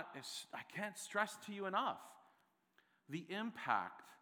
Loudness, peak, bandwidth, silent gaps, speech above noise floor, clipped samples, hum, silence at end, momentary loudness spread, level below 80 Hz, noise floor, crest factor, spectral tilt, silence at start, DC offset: -43 LUFS; -20 dBFS; over 20 kHz; none; 33 dB; under 0.1%; none; 0.05 s; 11 LU; under -90 dBFS; -77 dBFS; 24 dB; -3.5 dB/octave; 0 s; under 0.1%